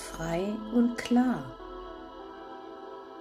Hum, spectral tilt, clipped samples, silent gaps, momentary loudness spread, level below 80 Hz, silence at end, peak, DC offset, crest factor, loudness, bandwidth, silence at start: none; -6 dB/octave; under 0.1%; none; 18 LU; -54 dBFS; 0 s; -14 dBFS; under 0.1%; 16 dB; -29 LUFS; 13 kHz; 0 s